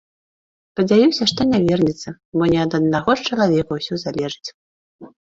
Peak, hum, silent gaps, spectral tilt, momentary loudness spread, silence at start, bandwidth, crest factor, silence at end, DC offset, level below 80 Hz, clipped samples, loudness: -2 dBFS; none; 2.25-2.32 s, 4.54-4.99 s; -6 dB/octave; 12 LU; 0.75 s; 7.8 kHz; 18 dB; 0.15 s; under 0.1%; -50 dBFS; under 0.1%; -18 LUFS